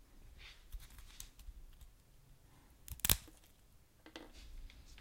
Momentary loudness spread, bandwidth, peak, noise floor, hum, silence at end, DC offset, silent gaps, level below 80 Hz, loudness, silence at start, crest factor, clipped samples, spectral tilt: 28 LU; 16.5 kHz; -4 dBFS; -65 dBFS; none; 0 s; under 0.1%; none; -54 dBFS; -37 LUFS; 0 s; 42 dB; under 0.1%; -1.5 dB/octave